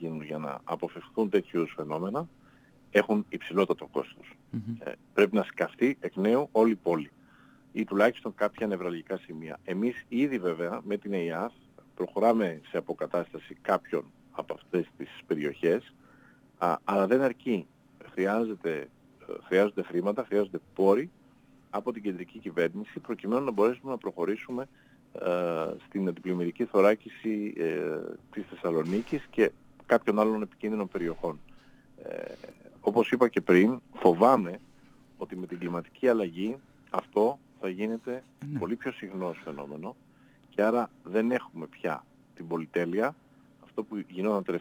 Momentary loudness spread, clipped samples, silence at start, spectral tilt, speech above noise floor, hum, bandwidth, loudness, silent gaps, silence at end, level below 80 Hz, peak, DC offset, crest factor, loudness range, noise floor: 15 LU; under 0.1%; 0 s; -7 dB/octave; 30 dB; none; over 20 kHz; -30 LUFS; none; 0 s; -68 dBFS; -6 dBFS; under 0.1%; 24 dB; 6 LU; -59 dBFS